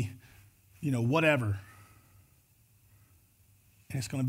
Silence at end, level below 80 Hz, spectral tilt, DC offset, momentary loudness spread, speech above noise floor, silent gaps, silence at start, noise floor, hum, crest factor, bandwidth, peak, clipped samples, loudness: 0 s; -66 dBFS; -6 dB/octave; under 0.1%; 20 LU; 36 dB; none; 0 s; -65 dBFS; none; 22 dB; 16 kHz; -12 dBFS; under 0.1%; -31 LUFS